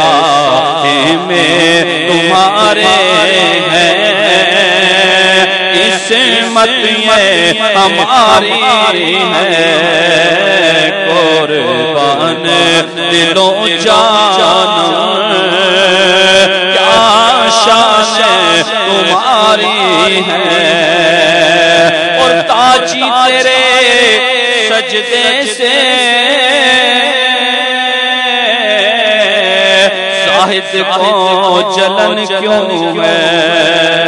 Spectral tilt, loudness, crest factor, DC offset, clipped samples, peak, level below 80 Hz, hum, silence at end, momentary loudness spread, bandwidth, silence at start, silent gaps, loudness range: -2.5 dB/octave; -7 LUFS; 8 dB; under 0.1%; 0.7%; 0 dBFS; -50 dBFS; none; 0 s; 4 LU; 12 kHz; 0 s; none; 2 LU